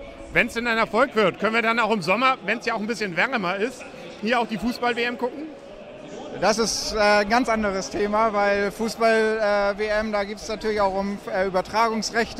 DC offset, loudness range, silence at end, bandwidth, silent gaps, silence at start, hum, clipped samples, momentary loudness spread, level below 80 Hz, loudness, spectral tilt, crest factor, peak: under 0.1%; 4 LU; 0 s; 15 kHz; none; 0 s; none; under 0.1%; 10 LU; -48 dBFS; -22 LUFS; -3.5 dB/octave; 20 dB; -4 dBFS